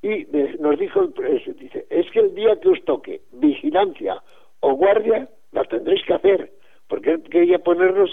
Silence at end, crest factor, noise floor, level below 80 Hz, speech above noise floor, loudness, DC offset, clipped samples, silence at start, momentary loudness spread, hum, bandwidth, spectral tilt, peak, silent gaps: 0 s; 14 dB; -43 dBFS; -62 dBFS; 24 dB; -20 LUFS; 0.6%; under 0.1%; 0.05 s; 12 LU; none; 3.9 kHz; -7.5 dB/octave; -4 dBFS; none